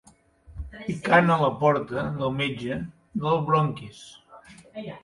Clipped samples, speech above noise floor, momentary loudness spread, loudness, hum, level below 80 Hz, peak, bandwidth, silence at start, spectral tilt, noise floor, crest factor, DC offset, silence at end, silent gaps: under 0.1%; 29 dB; 22 LU; -24 LUFS; none; -50 dBFS; -6 dBFS; 11.5 kHz; 0.5 s; -7 dB/octave; -53 dBFS; 20 dB; under 0.1%; 0.05 s; none